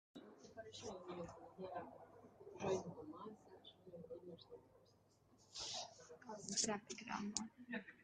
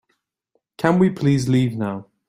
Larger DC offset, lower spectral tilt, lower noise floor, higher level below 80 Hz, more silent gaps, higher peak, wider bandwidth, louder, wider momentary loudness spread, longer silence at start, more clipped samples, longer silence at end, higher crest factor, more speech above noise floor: neither; second, -3 dB/octave vs -7.5 dB/octave; about the same, -73 dBFS vs -72 dBFS; second, -80 dBFS vs -54 dBFS; neither; second, -20 dBFS vs -2 dBFS; second, 10 kHz vs 15 kHz; second, -48 LUFS vs -20 LUFS; first, 18 LU vs 8 LU; second, 0.15 s vs 0.8 s; neither; second, 0 s vs 0.25 s; first, 30 dB vs 18 dB; second, 26 dB vs 53 dB